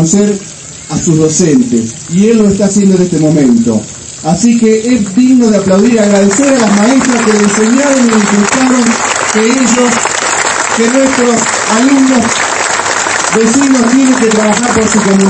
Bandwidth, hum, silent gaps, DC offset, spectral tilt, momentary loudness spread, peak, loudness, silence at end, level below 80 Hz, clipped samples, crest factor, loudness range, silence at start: 11 kHz; none; none; under 0.1%; -4 dB/octave; 4 LU; 0 dBFS; -8 LUFS; 0 s; -42 dBFS; 0.6%; 8 dB; 2 LU; 0 s